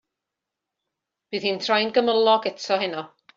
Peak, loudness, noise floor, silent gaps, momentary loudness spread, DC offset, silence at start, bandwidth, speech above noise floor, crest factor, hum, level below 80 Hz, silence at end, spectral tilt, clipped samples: -6 dBFS; -22 LUFS; -85 dBFS; none; 10 LU; under 0.1%; 1.3 s; 7.6 kHz; 63 dB; 18 dB; none; -72 dBFS; 0.3 s; -1 dB/octave; under 0.1%